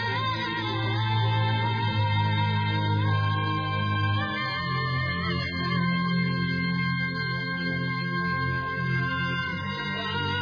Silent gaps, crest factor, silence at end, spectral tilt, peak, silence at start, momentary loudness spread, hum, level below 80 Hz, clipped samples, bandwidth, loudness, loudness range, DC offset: none; 14 dB; 0 s; -7 dB/octave; -14 dBFS; 0 s; 3 LU; none; -52 dBFS; under 0.1%; 5.2 kHz; -27 LUFS; 2 LU; under 0.1%